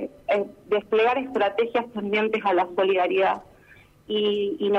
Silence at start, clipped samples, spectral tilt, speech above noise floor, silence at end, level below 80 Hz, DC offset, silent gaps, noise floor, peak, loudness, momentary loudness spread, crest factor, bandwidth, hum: 0 s; under 0.1%; -6 dB/octave; 30 dB; 0 s; -64 dBFS; under 0.1%; none; -53 dBFS; -10 dBFS; -24 LUFS; 5 LU; 14 dB; 7 kHz; none